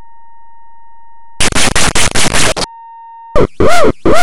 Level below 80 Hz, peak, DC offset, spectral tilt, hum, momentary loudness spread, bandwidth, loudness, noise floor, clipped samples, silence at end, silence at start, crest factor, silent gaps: -24 dBFS; 0 dBFS; under 0.1%; -3 dB/octave; none; 15 LU; over 20 kHz; -12 LUFS; -42 dBFS; 3%; 0 s; 1.4 s; 10 dB; none